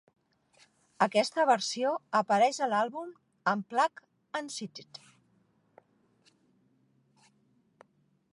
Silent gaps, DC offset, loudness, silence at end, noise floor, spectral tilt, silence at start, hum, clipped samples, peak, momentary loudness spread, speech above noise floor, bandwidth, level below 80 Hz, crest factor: none; under 0.1%; -29 LUFS; 3.5 s; -70 dBFS; -3.5 dB/octave; 1 s; none; under 0.1%; -12 dBFS; 17 LU; 40 dB; 11.5 kHz; -86 dBFS; 22 dB